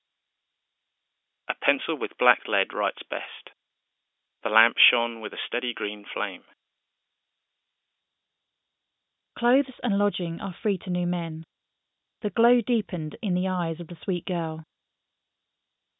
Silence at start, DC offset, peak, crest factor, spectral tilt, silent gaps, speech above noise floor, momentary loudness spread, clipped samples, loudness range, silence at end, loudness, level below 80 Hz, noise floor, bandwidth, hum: 1.5 s; under 0.1%; -2 dBFS; 28 dB; -9.5 dB/octave; none; 58 dB; 13 LU; under 0.1%; 9 LU; 1.35 s; -26 LUFS; -72 dBFS; -84 dBFS; 4 kHz; none